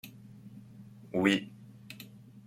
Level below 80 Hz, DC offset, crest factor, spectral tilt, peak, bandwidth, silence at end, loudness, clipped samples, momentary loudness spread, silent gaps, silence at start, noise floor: -72 dBFS; under 0.1%; 26 dB; -5.5 dB/octave; -10 dBFS; 16 kHz; 0.05 s; -30 LUFS; under 0.1%; 24 LU; none; 0.05 s; -52 dBFS